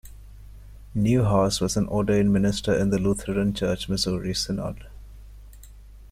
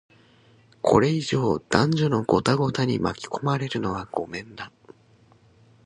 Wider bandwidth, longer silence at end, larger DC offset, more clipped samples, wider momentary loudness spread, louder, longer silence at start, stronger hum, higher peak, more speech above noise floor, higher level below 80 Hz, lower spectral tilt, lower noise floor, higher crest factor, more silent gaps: first, 15 kHz vs 11 kHz; second, 0.05 s vs 1.2 s; neither; neither; second, 8 LU vs 14 LU; about the same, -24 LUFS vs -24 LUFS; second, 0.05 s vs 0.85 s; neither; second, -10 dBFS vs 0 dBFS; second, 22 dB vs 34 dB; first, -42 dBFS vs -52 dBFS; about the same, -5.5 dB/octave vs -6 dB/octave; second, -45 dBFS vs -57 dBFS; second, 16 dB vs 24 dB; neither